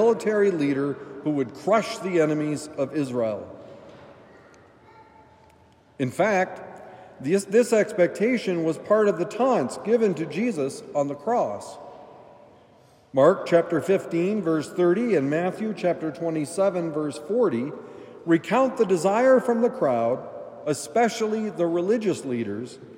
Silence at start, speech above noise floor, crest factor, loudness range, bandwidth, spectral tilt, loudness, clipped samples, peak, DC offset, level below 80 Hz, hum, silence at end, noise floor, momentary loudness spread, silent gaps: 0 s; 33 dB; 20 dB; 8 LU; 16 kHz; -6 dB/octave; -24 LUFS; under 0.1%; -4 dBFS; under 0.1%; -72 dBFS; none; 0 s; -56 dBFS; 11 LU; none